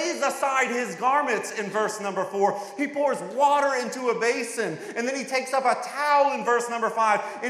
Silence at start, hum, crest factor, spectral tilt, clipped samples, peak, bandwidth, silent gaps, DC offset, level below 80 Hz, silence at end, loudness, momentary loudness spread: 0 s; none; 16 dB; -3 dB/octave; under 0.1%; -8 dBFS; 15 kHz; none; under 0.1%; under -90 dBFS; 0 s; -24 LUFS; 8 LU